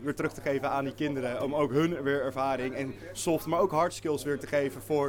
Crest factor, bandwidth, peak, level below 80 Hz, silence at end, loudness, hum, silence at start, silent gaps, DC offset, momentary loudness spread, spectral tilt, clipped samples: 16 dB; 19 kHz; -14 dBFS; -56 dBFS; 0 s; -30 LUFS; none; 0 s; none; under 0.1%; 5 LU; -5.5 dB/octave; under 0.1%